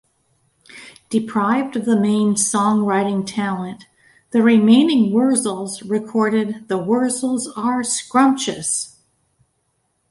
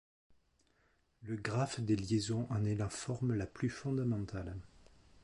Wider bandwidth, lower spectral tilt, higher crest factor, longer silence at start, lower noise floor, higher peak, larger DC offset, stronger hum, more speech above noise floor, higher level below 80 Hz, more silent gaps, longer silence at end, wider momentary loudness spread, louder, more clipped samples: about the same, 11.5 kHz vs 11.5 kHz; second, -4.5 dB/octave vs -6 dB/octave; about the same, 16 dB vs 18 dB; second, 0.75 s vs 1.2 s; second, -68 dBFS vs -74 dBFS; first, -2 dBFS vs -20 dBFS; neither; neither; first, 51 dB vs 38 dB; second, -64 dBFS vs -58 dBFS; neither; first, 1.2 s vs 0.6 s; about the same, 10 LU vs 10 LU; first, -18 LUFS vs -37 LUFS; neither